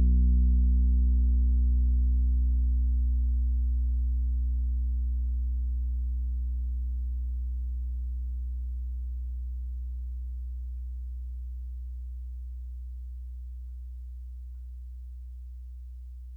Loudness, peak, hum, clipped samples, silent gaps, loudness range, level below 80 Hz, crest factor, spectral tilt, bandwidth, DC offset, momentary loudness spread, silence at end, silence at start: -30 LUFS; -18 dBFS; none; under 0.1%; none; 15 LU; -28 dBFS; 10 dB; -12 dB/octave; 0.4 kHz; under 0.1%; 18 LU; 0 s; 0 s